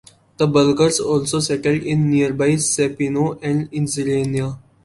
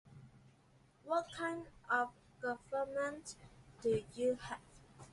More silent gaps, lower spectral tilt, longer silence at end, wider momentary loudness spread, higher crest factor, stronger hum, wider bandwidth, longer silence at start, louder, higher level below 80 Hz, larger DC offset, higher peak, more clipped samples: neither; about the same, -5 dB/octave vs -4.5 dB/octave; first, 0.25 s vs 0.05 s; second, 7 LU vs 20 LU; about the same, 16 dB vs 20 dB; neither; about the same, 11.5 kHz vs 11.5 kHz; first, 0.4 s vs 0.05 s; first, -18 LUFS vs -40 LUFS; first, -52 dBFS vs -68 dBFS; neither; first, -2 dBFS vs -22 dBFS; neither